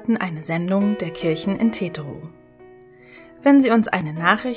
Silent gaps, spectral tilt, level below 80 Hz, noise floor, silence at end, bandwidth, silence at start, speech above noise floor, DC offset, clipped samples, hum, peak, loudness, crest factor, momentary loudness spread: none; -10.5 dB/octave; -58 dBFS; -46 dBFS; 0 s; 4 kHz; 0 s; 27 dB; under 0.1%; under 0.1%; none; 0 dBFS; -20 LUFS; 20 dB; 13 LU